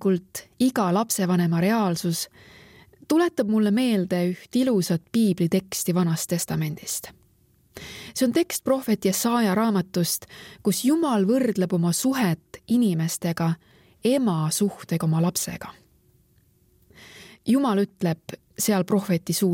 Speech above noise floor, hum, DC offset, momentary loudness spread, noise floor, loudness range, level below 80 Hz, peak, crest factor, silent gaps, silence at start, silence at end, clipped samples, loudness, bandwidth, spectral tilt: 38 dB; none; under 0.1%; 9 LU; -61 dBFS; 4 LU; -62 dBFS; -8 dBFS; 16 dB; none; 0 s; 0 s; under 0.1%; -24 LUFS; 17 kHz; -5.5 dB/octave